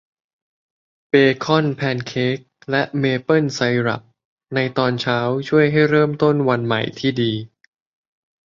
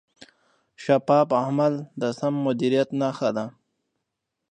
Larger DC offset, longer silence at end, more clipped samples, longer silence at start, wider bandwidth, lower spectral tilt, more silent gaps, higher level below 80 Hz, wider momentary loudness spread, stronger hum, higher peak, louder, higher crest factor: neither; about the same, 1 s vs 1 s; neither; first, 1.15 s vs 0.8 s; second, 7.4 kHz vs 9.6 kHz; about the same, -6.5 dB/octave vs -7 dB/octave; first, 4.25-4.37 s vs none; first, -58 dBFS vs -74 dBFS; about the same, 8 LU vs 10 LU; neither; first, -2 dBFS vs -6 dBFS; first, -19 LUFS vs -23 LUFS; about the same, 18 dB vs 20 dB